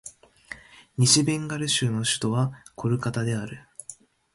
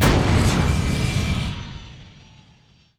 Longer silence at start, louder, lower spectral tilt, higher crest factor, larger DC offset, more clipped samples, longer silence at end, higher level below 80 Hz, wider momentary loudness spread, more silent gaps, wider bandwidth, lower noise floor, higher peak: about the same, 0.05 s vs 0 s; second, -24 LUFS vs -21 LUFS; second, -4 dB/octave vs -5.5 dB/octave; first, 22 dB vs 16 dB; neither; neither; second, 0.4 s vs 0.9 s; second, -60 dBFS vs -28 dBFS; first, 23 LU vs 19 LU; neither; second, 11.5 kHz vs over 20 kHz; second, -48 dBFS vs -54 dBFS; about the same, -4 dBFS vs -6 dBFS